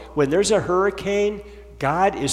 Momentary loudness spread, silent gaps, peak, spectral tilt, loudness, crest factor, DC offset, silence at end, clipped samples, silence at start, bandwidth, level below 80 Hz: 7 LU; none; -6 dBFS; -4.5 dB/octave; -21 LUFS; 14 dB; under 0.1%; 0 s; under 0.1%; 0 s; 13 kHz; -44 dBFS